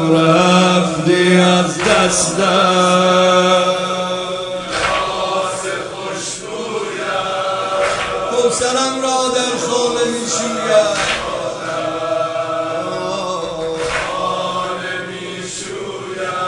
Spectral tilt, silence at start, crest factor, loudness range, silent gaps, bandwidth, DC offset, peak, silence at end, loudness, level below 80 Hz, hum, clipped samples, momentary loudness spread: -3.5 dB/octave; 0 s; 16 dB; 8 LU; none; 11 kHz; under 0.1%; 0 dBFS; 0 s; -16 LUFS; -48 dBFS; none; under 0.1%; 12 LU